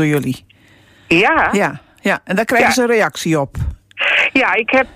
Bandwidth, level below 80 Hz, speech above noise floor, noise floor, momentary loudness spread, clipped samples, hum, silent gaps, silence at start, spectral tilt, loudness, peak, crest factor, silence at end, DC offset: 16 kHz; -38 dBFS; 33 dB; -48 dBFS; 11 LU; under 0.1%; none; none; 0 s; -4.5 dB/octave; -14 LUFS; -2 dBFS; 14 dB; 0.1 s; under 0.1%